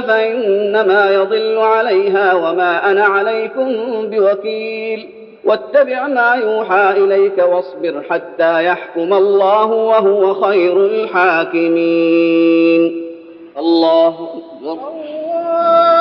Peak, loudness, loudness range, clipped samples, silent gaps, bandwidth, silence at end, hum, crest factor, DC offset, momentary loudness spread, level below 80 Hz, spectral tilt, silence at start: 0 dBFS; -13 LUFS; 3 LU; under 0.1%; none; 5.6 kHz; 0 s; none; 12 dB; under 0.1%; 10 LU; -70 dBFS; -7.5 dB/octave; 0 s